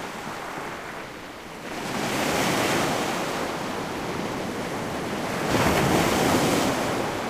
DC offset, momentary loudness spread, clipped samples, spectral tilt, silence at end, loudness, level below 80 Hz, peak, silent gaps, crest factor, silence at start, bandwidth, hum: under 0.1%; 13 LU; under 0.1%; -4 dB/octave; 0 s; -25 LUFS; -48 dBFS; -8 dBFS; none; 18 dB; 0 s; 15.5 kHz; none